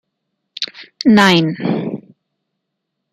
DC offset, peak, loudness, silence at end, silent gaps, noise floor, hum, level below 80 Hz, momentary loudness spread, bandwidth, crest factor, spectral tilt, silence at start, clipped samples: under 0.1%; 0 dBFS; -15 LUFS; 1.15 s; none; -76 dBFS; none; -58 dBFS; 16 LU; 13.5 kHz; 18 dB; -5.5 dB/octave; 0.6 s; under 0.1%